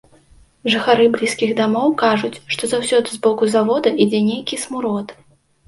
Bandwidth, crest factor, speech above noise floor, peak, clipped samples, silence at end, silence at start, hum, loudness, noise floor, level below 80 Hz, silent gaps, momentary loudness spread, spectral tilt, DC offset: 11.5 kHz; 16 dB; 33 dB; -2 dBFS; under 0.1%; 0.55 s; 0.65 s; none; -17 LUFS; -50 dBFS; -58 dBFS; none; 9 LU; -4 dB/octave; under 0.1%